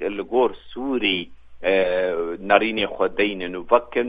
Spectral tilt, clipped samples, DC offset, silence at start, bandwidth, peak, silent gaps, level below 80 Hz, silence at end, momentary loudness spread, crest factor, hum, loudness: -7 dB/octave; under 0.1%; under 0.1%; 0 s; 5 kHz; 0 dBFS; none; -52 dBFS; 0 s; 8 LU; 22 dB; none; -22 LUFS